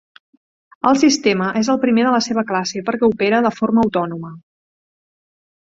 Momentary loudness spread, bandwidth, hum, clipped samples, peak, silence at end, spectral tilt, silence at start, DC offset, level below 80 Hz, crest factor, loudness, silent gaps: 8 LU; 7.8 kHz; none; under 0.1%; -2 dBFS; 1.35 s; -4.5 dB/octave; 0.85 s; under 0.1%; -56 dBFS; 16 dB; -17 LUFS; none